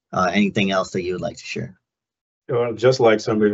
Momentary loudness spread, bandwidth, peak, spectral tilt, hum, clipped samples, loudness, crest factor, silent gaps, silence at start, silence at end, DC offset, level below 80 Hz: 13 LU; 7.8 kHz; -4 dBFS; -5.5 dB/octave; none; under 0.1%; -20 LUFS; 18 dB; 2.21-2.42 s; 0.1 s; 0 s; under 0.1%; -60 dBFS